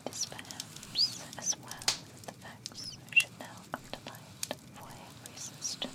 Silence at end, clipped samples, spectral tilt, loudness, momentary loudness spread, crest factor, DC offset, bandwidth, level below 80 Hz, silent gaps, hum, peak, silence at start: 0 s; under 0.1%; -0.5 dB/octave; -34 LUFS; 20 LU; 24 dB; under 0.1%; 17.5 kHz; -68 dBFS; none; none; -14 dBFS; 0 s